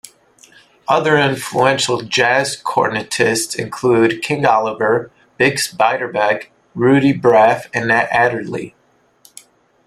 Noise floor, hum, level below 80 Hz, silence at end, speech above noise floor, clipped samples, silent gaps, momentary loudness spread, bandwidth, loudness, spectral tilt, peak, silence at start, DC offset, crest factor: -52 dBFS; none; -56 dBFS; 1.2 s; 37 dB; under 0.1%; none; 7 LU; 15.5 kHz; -15 LUFS; -4 dB/octave; 0 dBFS; 0.9 s; under 0.1%; 16 dB